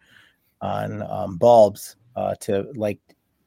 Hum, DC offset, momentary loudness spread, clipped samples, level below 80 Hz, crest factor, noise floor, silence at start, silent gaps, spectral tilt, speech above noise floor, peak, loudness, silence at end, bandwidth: none; under 0.1%; 19 LU; under 0.1%; -62 dBFS; 18 dB; -56 dBFS; 0.6 s; none; -6.5 dB/octave; 35 dB; -4 dBFS; -21 LUFS; 0.5 s; 16.5 kHz